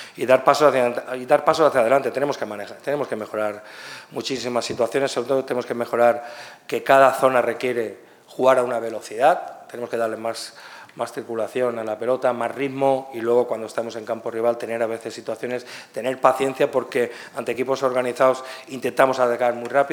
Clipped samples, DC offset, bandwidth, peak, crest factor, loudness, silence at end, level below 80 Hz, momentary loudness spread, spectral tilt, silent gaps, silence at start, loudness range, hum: under 0.1%; under 0.1%; 19 kHz; 0 dBFS; 22 dB; -22 LUFS; 0 s; -72 dBFS; 13 LU; -4.5 dB/octave; none; 0 s; 5 LU; none